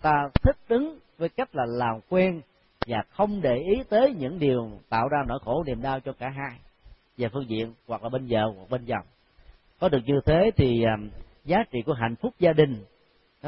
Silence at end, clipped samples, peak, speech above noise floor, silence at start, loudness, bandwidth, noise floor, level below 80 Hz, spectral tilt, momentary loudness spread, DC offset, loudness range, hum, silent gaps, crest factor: 0 s; under 0.1%; -6 dBFS; 39 dB; 0 s; -26 LUFS; 5.8 kHz; -63 dBFS; -42 dBFS; -11.5 dB/octave; 12 LU; under 0.1%; 7 LU; none; none; 20 dB